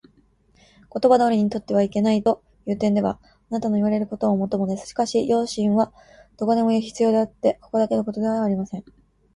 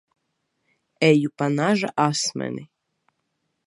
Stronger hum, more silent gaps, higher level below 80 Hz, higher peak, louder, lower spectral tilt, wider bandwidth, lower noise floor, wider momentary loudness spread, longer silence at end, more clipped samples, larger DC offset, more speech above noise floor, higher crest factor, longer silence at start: neither; neither; first, -56 dBFS vs -72 dBFS; about the same, -4 dBFS vs -2 dBFS; about the same, -22 LUFS vs -22 LUFS; first, -7 dB/octave vs -5 dB/octave; about the same, 11 kHz vs 11.5 kHz; second, -59 dBFS vs -75 dBFS; second, 8 LU vs 12 LU; second, 0.55 s vs 1 s; neither; neither; second, 38 dB vs 54 dB; about the same, 18 dB vs 22 dB; about the same, 0.95 s vs 1 s